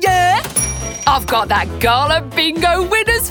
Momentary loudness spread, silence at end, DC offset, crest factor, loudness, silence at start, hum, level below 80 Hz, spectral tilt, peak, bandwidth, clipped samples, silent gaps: 4 LU; 0 s; under 0.1%; 14 dB; -15 LUFS; 0 s; none; -30 dBFS; -3 dB/octave; 0 dBFS; over 20 kHz; under 0.1%; none